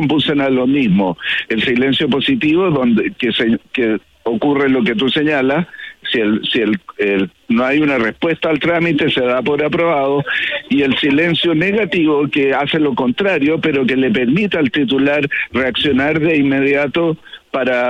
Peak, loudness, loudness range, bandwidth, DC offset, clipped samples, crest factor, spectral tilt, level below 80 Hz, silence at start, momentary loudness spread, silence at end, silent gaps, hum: -4 dBFS; -15 LUFS; 2 LU; 8.2 kHz; under 0.1%; under 0.1%; 10 dB; -7 dB/octave; -50 dBFS; 0 s; 4 LU; 0 s; none; none